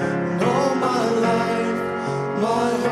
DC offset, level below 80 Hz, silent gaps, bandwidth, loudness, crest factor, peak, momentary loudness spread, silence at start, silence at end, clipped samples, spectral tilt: under 0.1%; -58 dBFS; none; 13.5 kHz; -21 LUFS; 14 dB; -8 dBFS; 5 LU; 0 s; 0 s; under 0.1%; -6 dB/octave